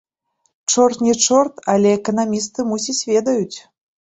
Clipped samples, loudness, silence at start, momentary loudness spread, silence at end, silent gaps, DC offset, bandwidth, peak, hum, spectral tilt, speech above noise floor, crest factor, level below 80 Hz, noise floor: under 0.1%; -17 LUFS; 0.7 s; 8 LU; 0.45 s; none; under 0.1%; 8.4 kHz; -2 dBFS; none; -3.5 dB/octave; 51 dB; 16 dB; -60 dBFS; -68 dBFS